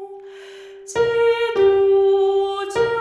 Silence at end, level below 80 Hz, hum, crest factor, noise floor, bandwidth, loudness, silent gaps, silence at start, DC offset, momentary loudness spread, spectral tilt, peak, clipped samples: 0 s; -56 dBFS; none; 12 dB; -39 dBFS; 10.5 kHz; -18 LUFS; none; 0 s; under 0.1%; 22 LU; -4.5 dB/octave; -6 dBFS; under 0.1%